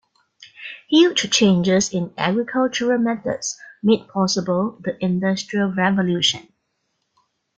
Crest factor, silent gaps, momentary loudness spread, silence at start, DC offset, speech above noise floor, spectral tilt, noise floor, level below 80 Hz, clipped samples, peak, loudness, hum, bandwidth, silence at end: 18 dB; none; 10 LU; 0.4 s; under 0.1%; 53 dB; -4.5 dB/octave; -72 dBFS; -60 dBFS; under 0.1%; -2 dBFS; -19 LUFS; none; 9 kHz; 1.15 s